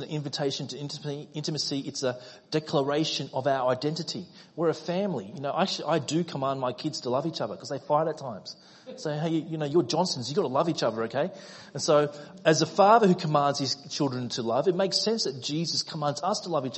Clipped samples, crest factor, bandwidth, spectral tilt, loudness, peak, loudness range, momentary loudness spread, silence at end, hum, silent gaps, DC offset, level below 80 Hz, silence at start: under 0.1%; 20 dB; 8.6 kHz; -4.5 dB/octave; -27 LUFS; -8 dBFS; 6 LU; 11 LU; 0 s; none; none; under 0.1%; -72 dBFS; 0 s